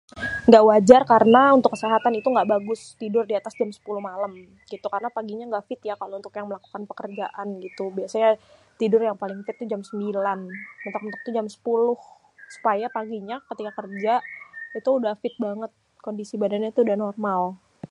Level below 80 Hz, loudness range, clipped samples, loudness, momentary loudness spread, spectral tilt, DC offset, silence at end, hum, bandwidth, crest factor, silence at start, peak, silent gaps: -62 dBFS; 13 LU; under 0.1%; -22 LUFS; 20 LU; -6 dB/octave; under 0.1%; 0.05 s; none; 11 kHz; 22 dB; 0.15 s; 0 dBFS; none